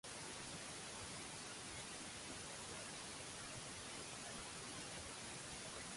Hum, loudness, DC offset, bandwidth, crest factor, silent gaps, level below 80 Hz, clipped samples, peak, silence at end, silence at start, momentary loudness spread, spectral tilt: none; -49 LUFS; under 0.1%; 11.5 kHz; 14 dB; none; -70 dBFS; under 0.1%; -36 dBFS; 0 s; 0.05 s; 0 LU; -2 dB/octave